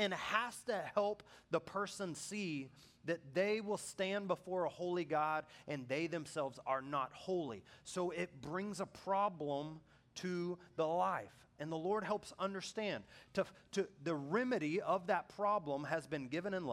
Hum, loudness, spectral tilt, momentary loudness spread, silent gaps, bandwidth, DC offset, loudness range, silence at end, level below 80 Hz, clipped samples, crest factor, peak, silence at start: none; -40 LUFS; -5 dB/octave; 8 LU; none; 16 kHz; under 0.1%; 3 LU; 0 s; -78 dBFS; under 0.1%; 22 dB; -18 dBFS; 0 s